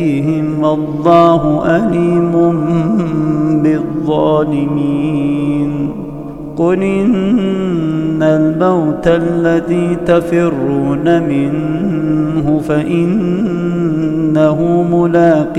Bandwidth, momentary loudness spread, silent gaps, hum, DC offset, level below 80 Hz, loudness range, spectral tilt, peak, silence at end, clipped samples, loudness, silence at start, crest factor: 9.2 kHz; 5 LU; none; none; under 0.1%; -40 dBFS; 3 LU; -8.5 dB/octave; 0 dBFS; 0 s; under 0.1%; -13 LUFS; 0 s; 12 dB